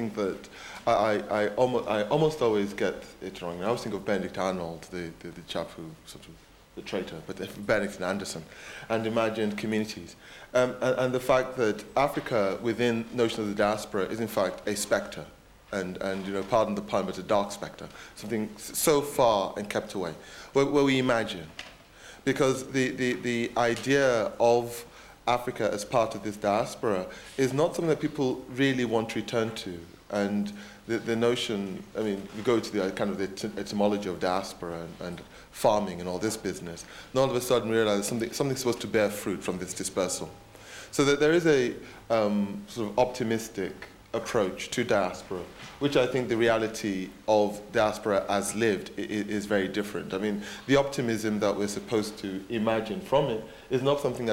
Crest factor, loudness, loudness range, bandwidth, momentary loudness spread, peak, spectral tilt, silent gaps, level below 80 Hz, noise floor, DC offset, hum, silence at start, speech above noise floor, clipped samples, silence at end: 20 dB; -28 LUFS; 4 LU; 17 kHz; 14 LU; -10 dBFS; -4.5 dB/octave; none; -58 dBFS; -50 dBFS; under 0.1%; none; 0 s; 22 dB; under 0.1%; 0 s